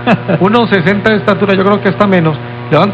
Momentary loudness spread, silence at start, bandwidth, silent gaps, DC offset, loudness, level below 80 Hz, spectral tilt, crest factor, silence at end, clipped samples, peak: 3 LU; 0 s; 7.6 kHz; none; under 0.1%; -10 LUFS; -44 dBFS; -8 dB/octave; 10 dB; 0 s; 0.2%; 0 dBFS